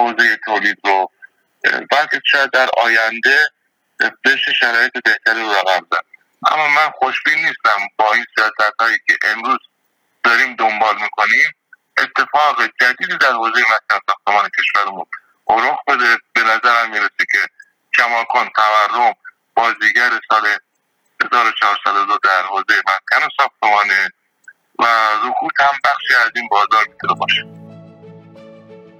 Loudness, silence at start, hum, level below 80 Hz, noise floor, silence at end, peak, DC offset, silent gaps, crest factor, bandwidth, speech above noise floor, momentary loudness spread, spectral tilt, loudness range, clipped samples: -14 LUFS; 0 s; none; -68 dBFS; -65 dBFS; 0.25 s; -2 dBFS; under 0.1%; none; 14 dB; 16.5 kHz; 50 dB; 6 LU; -1.5 dB/octave; 1 LU; under 0.1%